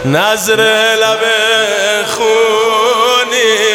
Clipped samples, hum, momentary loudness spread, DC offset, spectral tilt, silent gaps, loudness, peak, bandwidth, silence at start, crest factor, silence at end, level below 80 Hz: under 0.1%; none; 3 LU; under 0.1%; -2 dB/octave; none; -10 LUFS; 0 dBFS; 18 kHz; 0 s; 10 dB; 0 s; -52 dBFS